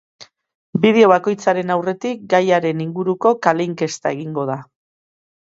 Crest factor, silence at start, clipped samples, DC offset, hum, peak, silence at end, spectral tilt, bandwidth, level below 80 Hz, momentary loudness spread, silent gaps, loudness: 18 dB; 0.2 s; under 0.1%; under 0.1%; none; 0 dBFS; 0.85 s; -6 dB/octave; 8 kHz; -66 dBFS; 11 LU; 0.55-0.73 s; -17 LUFS